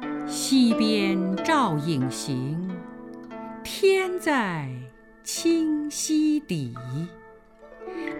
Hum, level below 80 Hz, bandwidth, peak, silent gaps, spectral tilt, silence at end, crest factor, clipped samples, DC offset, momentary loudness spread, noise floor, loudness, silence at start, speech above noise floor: none; -60 dBFS; 17 kHz; -10 dBFS; none; -4.5 dB/octave; 0 s; 16 dB; under 0.1%; under 0.1%; 17 LU; -49 dBFS; -25 LUFS; 0 s; 25 dB